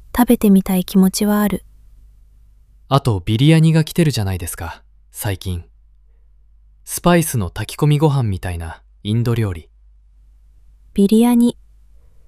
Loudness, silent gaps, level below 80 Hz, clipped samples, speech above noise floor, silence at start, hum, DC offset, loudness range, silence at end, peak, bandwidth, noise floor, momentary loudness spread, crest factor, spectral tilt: -17 LUFS; none; -40 dBFS; under 0.1%; 33 dB; 0.15 s; 50 Hz at -40 dBFS; under 0.1%; 5 LU; 0.75 s; -2 dBFS; 16 kHz; -48 dBFS; 15 LU; 16 dB; -6.5 dB/octave